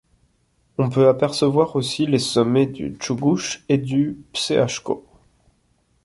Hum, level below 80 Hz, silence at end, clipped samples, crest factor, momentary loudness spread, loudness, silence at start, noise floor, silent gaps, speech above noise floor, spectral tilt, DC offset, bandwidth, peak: none; -56 dBFS; 1.05 s; under 0.1%; 18 dB; 10 LU; -20 LUFS; 0.8 s; -64 dBFS; none; 44 dB; -5.5 dB/octave; under 0.1%; 11.5 kHz; -4 dBFS